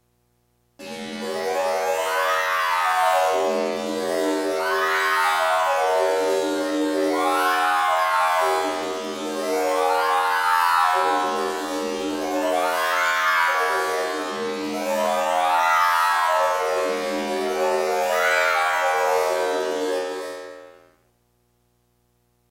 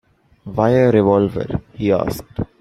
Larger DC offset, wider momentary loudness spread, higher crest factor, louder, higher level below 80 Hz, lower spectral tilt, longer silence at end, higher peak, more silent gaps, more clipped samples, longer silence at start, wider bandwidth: neither; second, 8 LU vs 13 LU; about the same, 16 dB vs 16 dB; second, -21 LUFS vs -17 LUFS; second, -66 dBFS vs -42 dBFS; second, -2 dB/octave vs -8 dB/octave; first, 1.8 s vs 0.15 s; second, -6 dBFS vs -2 dBFS; neither; neither; first, 0.8 s vs 0.45 s; first, 16 kHz vs 14.5 kHz